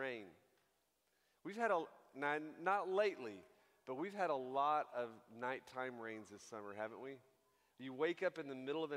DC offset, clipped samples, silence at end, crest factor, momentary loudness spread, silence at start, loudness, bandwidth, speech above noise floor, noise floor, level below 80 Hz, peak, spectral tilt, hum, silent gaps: under 0.1%; under 0.1%; 0 s; 22 dB; 15 LU; 0 s; -43 LUFS; 15.5 kHz; 40 dB; -82 dBFS; under -90 dBFS; -22 dBFS; -5 dB/octave; none; none